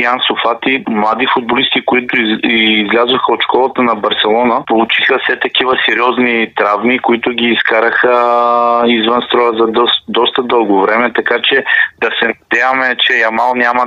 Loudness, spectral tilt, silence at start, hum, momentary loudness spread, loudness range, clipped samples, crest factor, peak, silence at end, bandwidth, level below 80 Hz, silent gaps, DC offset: -11 LUFS; -5 dB/octave; 0 s; none; 3 LU; 1 LU; under 0.1%; 12 dB; 0 dBFS; 0 s; 7.4 kHz; -56 dBFS; none; under 0.1%